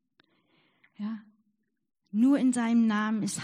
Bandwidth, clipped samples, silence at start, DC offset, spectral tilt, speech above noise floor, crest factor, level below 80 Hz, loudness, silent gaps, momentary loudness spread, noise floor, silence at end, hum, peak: 13 kHz; under 0.1%; 1 s; under 0.1%; -5 dB/octave; 51 dB; 14 dB; -80 dBFS; -27 LUFS; none; 15 LU; -77 dBFS; 0 s; none; -16 dBFS